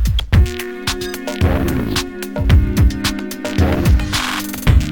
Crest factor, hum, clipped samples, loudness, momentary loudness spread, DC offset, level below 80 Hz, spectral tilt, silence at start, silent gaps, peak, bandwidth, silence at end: 16 dB; none; under 0.1%; -17 LUFS; 8 LU; 0.8%; -18 dBFS; -5.5 dB/octave; 0 s; none; 0 dBFS; 18 kHz; 0 s